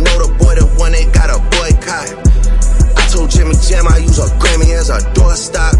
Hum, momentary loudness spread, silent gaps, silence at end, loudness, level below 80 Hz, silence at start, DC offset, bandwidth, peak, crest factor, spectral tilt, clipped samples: none; 3 LU; none; 0 s; -12 LUFS; -10 dBFS; 0 s; under 0.1%; 11.5 kHz; 0 dBFS; 8 dB; -4.5 dB/octave; under 0.1%